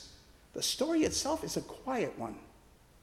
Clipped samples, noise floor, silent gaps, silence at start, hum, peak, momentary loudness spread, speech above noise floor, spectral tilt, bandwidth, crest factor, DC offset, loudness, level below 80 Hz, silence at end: under 0.1%; -60 dBFS; none; 0 s; none; -18 dBFS; 16 LU; 27 dB; -3 dB/octave; 16 kHz; 18 dB; under 0.1%; -34 LUFS; -60 dBFS; 0.5 s